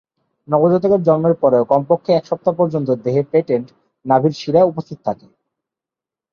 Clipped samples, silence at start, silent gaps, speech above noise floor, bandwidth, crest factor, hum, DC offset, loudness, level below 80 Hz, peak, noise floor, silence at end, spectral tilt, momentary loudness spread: under 0.1%; 0.5 s; none; 72 dB; 6.8 kHz; 16 dB; none; under 0.1%; -16 LUFS; -60 dBFS; -2 dBFS; -88 dBFS; 1.2 s; -8.5 dB/octave; 11 LU